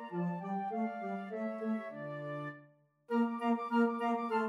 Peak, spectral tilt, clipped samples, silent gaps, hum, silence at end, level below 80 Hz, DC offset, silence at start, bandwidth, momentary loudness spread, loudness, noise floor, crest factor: -20 dBFS; -8 dB/octave; under 0.1%; none; none; 0 s; under -90 dBFS; under 0.1%; 0 s; 10 kHz; 11 LU; -36 LUFS; -64 dBFS; 16 dB